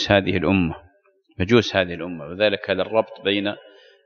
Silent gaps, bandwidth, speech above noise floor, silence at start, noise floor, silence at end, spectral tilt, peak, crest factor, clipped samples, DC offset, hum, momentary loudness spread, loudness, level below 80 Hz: none; 7 kHz; 39 dB; 0 s; -60 dBFS; 0.45 s; -6 dB/octave; -2 dBFS; 20 dB; under 0.1%; under 0.1%; none; 12 LU; -21 LUFS; -48 dBFS